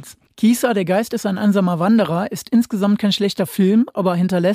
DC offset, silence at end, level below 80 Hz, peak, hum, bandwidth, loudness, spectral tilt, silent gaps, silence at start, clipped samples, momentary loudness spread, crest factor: under 0.1%; 0 s; -62 dBFS; -6 dBFS; none; 16 kHz; -17 LUFS; -6 dB/octave; none; 0 s; under 0.1%; 4 LU; 12 dB